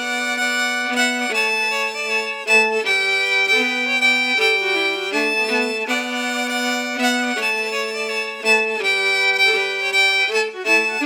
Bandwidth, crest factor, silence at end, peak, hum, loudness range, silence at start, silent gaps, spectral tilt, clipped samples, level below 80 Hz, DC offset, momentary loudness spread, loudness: over 20 kHz; 16 dB; 0 s; -4 dBFS; none; 3 LU; 0 s; none; -0.5 dB/octave; under 0.1%; -90 dBFS; under 0.1%; 6 LU; -17 LUFS